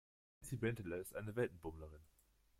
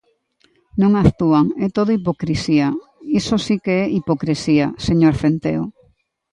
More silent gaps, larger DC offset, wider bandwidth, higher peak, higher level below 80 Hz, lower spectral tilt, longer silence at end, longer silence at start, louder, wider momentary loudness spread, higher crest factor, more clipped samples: neither; neither; first, 16.5 kHz vs 10.5 kHz; second, -26 dBFS vs 0 dBFS; second, -66 dBFS vs -40 dBFS; about the same, -6.5 dB/octave vs -7 dB/octave; about the same, 0.55 s vs 0.65 s; second, 0.4 s vs 0.75 s; second, -45 LUFS vs -18 LUFS; first, 16 LU vs 8 LU; about the same, 20 dB vs 18 dB; neither